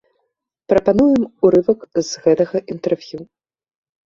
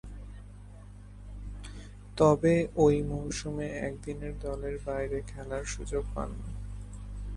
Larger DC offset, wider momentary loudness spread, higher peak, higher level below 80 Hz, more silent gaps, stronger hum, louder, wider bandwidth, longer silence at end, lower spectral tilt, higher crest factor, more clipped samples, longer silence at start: neither; second, 9 LU vs 23 LU; first, -2 dBFS vs -10 dBFS; second, -50 dBFS vs -42 dBFS; neither; second, none vs 50 Hz at -40 dBFS; first, -17 LUFS vs -30 LUFS; second, 7.6 kHz vs 11.5 kHz; first, 0.8 s vs 0 s; about the same, -6 dB/octave vs -6.5 dB/octave; second, 16 dB vs 22 dB; neither; first, 0.7 s vs 0.05 s